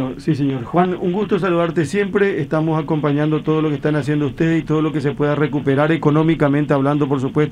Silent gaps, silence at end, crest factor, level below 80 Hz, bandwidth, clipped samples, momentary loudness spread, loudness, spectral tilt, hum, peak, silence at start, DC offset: none; 0 s; 16 dB; -46 dBFS; 10.5 kHz; under 0.1%; 4 LU; -18 LUFS; -8 dB/octave; none; -2 dBFS; 0 s; under 0.1%